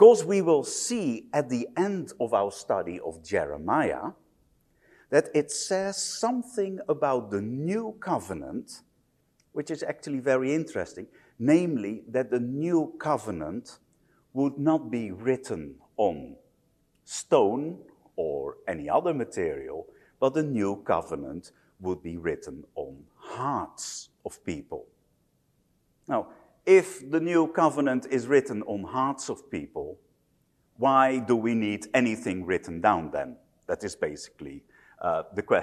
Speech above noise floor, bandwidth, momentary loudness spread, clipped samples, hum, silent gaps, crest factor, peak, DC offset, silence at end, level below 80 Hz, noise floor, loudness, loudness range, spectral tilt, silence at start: 43 dB; 13 kHz; 16 LU; under 0.1%; none; none; 24 dB; -4 dBFS; under 0.1%; 0 s; -62 dBFS; -69 dBFS; -28 LUFS; 7 LU; -5 dB/octave; 0 s